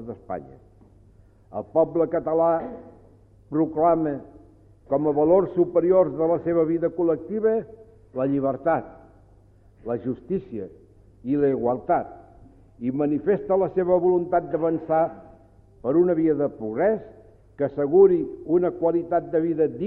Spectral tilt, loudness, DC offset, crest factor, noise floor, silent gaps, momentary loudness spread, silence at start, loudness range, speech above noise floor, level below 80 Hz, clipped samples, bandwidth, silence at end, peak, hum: -12 dB/octave; -23 LUFS; under 0.1%; 18 dB; -54 dBFS; none; 15 LU; 0 s; 6 LU; 31 dB; -56 dBFS; under 0.1%; 3.5 kHz; 0 s; -6 dBFS; none